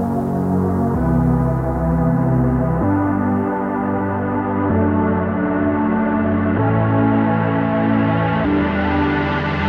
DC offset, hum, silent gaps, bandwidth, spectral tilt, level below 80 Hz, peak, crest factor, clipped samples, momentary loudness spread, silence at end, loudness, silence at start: under 0.1%; none; none; 5.8 kHz; -9.5 dB/octave; -32 dBFS; -4 dBFS; 12 dB; under 0.1%; 4 LU; 0 s; -18 LUFS; 0 s